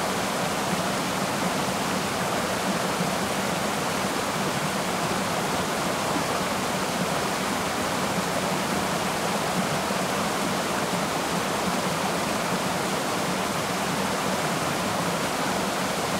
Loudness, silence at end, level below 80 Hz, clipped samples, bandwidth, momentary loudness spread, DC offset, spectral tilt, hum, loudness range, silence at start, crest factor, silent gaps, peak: -26 LUFS; 0 s; -54 dBFS; under 0.1%; 16 kHz; 1 LU; under 0.1%; -3.5 dB/octave; none; 0 LU; 0 s; 14 dB; none; -12 dBFS